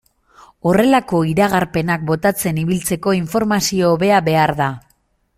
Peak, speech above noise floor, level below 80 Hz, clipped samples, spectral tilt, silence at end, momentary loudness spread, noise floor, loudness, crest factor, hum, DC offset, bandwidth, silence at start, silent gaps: -2 dBFS; 45 dB; -46 dBFS; under 0.1%; -5.5 dB/octave; 0.6 s; 6 LU; -61 dBFS; -16 LUFS; 16 dB; none; under 0.1%; 16 kHz; 0.65 s; none